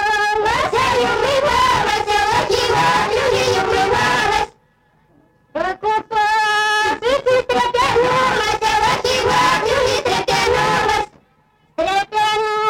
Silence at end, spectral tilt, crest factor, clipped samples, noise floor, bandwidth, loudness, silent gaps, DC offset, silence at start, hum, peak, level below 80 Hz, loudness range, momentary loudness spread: 0 s; -3 dB/octave; 12 dB; under 0.1%; -57 dBFS; 17 kHz; -16 LUFS; none; under 0.1%; 0 s; none; -6 dBFS; -40 dBFS; 3 LU; 5 LU